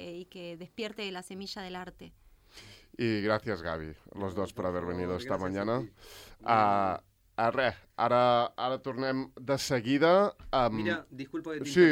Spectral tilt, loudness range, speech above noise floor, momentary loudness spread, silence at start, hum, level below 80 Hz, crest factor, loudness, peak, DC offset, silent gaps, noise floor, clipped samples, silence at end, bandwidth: -5.5 dB/octave; 8 LU; 24 dB; 18 LU; 0 s; none; -58 dBFS; 20 dB; -30 LUFS; -10 dBFS; under 0.1%; none; -54 dBFS; under 0.1%; 0 s; 16.5 kHz